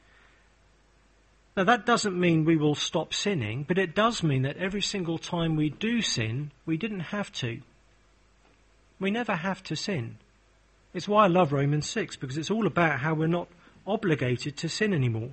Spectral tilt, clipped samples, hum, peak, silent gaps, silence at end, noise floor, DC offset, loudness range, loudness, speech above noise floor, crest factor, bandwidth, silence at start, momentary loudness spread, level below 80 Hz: -5 dB/octave; under 0.1%; none; -8 dBFS; none; 0 s; -62 dBFS; under 0.1%; 8 LU; -27 LUFS; 35 dB; 20 dB; 8.8 kHz; 1.55 s; 10 LU; -58 dBFS